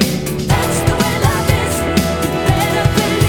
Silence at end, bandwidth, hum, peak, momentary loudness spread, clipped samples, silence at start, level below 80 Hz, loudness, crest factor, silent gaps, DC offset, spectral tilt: 0 s; over 20 kHz; none; 0 dBFS; 2 LU; under 0.1%; 0 s; -28 dBFS; -15 LUFS; 14 dB; none; under 0.1%; -5 dB/octave